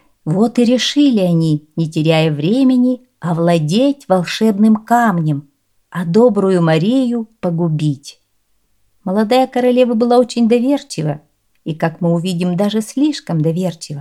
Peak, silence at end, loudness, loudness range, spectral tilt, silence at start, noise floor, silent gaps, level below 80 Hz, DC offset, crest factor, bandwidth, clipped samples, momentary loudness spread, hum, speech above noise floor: 0 dBFS; 0 s; -15 LUFS; 3 LU; -6.5 dB/octave; 0.25 s; -63 dBFS; none; -62 dBFS; 0.1%; 14 dB; 13.5 kHz; under 0.1%; 9 LU; none; 50 dB